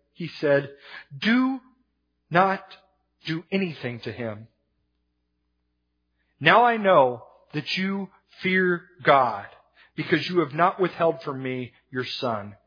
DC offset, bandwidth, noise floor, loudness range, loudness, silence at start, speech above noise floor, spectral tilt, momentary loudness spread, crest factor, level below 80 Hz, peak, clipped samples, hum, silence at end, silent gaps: under 0.1%; 5.2 kHz; -75 dBFS; 9 LU; -24 LUFS; 0.2 s; 51 dB; -7 dB/octave; 18 LU; 24 dB; -72 dBFS; -2 dBFS; under 0.1%; 60 Hz at -55 dBFS; 0.1 s; none